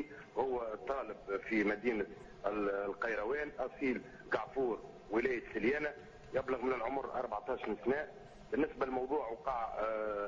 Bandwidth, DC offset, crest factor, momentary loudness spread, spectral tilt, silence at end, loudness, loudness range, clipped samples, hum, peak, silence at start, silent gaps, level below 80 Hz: 7.6 kHz; under 0.1%; 18 dB; 6 LU; -6.5 dB/octave; 0 s; -38 LUFS; 1 LU; under 0.1%; none; -20 dBFS; 0 s; none; -62 dBFS